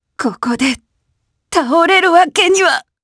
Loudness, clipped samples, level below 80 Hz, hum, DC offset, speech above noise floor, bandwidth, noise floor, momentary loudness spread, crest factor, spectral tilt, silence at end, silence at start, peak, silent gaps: -12 LUFS; under 0.1%; -52 dBFS; none; under 0.1%; 55 dB; 11 kHz; -67 dBFS; 10 LU; 14 dB; -2 dB/octave; 0.25 s; 0.2 s; 0 dBFS; none